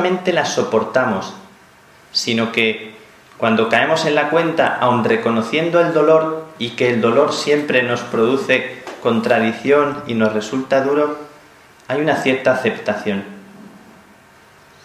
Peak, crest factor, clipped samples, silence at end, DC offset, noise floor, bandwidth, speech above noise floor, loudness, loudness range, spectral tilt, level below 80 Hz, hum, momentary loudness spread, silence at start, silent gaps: 0 dBFS; 18 dB; under 0.1%; 1.1 s; under 0.1%; -47 dBFS; 13 kHz; 30 dB; -17 LUFS; 4 LU; -5 dB/octave; -62 dBFS; none; 9 LU; 0 s; none